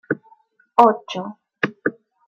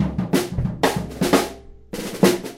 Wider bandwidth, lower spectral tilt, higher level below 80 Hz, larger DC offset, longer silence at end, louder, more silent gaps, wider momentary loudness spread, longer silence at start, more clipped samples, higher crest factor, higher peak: second, 8 kHz vs 16 kHz; about the same, -6 dB/octave vs -5 dB/octave; second, -72 dBFS vs -38 dBFS; neither; first, 0.35 s vs 0 s; about the same, -21 LUFS vs -22 LUFS; neither; first, 15 LU vs 12 LU; about the same, 0.1 s vs 0 s; neither; about the same, 20 dB vs 20 dB; about the same, -2 dBFS vs 0 dBFS